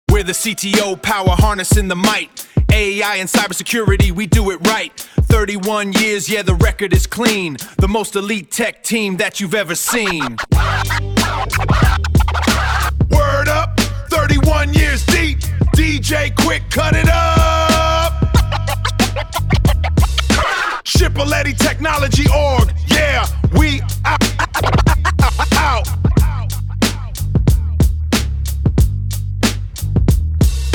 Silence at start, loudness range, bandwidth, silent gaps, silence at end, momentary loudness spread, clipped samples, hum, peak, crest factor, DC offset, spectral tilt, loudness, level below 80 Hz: 0.1 s; 3 LU; 19 kHz; none; 0 s; 5 LU; under 0.1%; none; 0 dBFS; 14 dB; 0.5%; -4.5 dB/octave; -15 LUFS; -20 dBFS